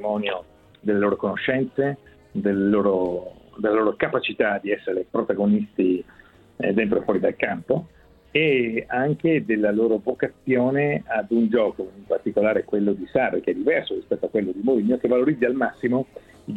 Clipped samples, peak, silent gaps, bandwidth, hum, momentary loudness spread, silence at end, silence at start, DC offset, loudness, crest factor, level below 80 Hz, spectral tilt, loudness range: under 0.1%; -4 dBFS; none; 4.4 kHz; none; 7 LU; 0 s; 0 s; under 0.1%; -23 LUFS; 18 dB; -58 dBFS; -8.5 dB/octave; 2 LU